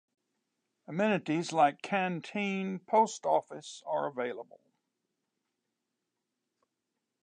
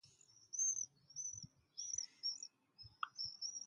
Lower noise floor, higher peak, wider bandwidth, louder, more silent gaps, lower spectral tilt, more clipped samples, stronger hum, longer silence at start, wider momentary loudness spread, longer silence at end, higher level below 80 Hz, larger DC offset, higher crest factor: first, -86 dBFS vs -68 dBFS; first, -14 dBFS vs -26 dBFS; about the same, 10 kHz vs 11 kHz; first, -31 LUFS vs -43 LUFS; neither; first, -5 dB/octave vs 2 dB/octave; neither; neither; first, 0.9 s vs 0.05 s; second, 11 LU vs 16 LU; first, 2.8 s vs 0 s; second, -88 dBFS vs -80 dBFS; neither; about the same, 20 dB vs 22 dB